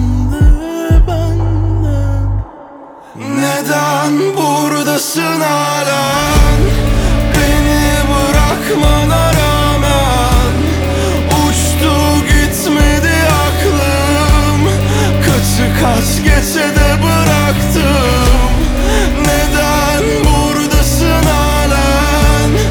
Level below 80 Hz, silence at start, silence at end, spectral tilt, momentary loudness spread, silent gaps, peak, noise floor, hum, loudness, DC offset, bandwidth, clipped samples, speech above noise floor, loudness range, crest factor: -16 dBFS; 0 s; 0 s; -5 dB/octave; 3 LU; none; 0 dBFS; -33 dBFS; none; -12 LUFS; under 0.1%; over 20 kHz; under 0.1%; 20 dB; 4 LU; 10 dB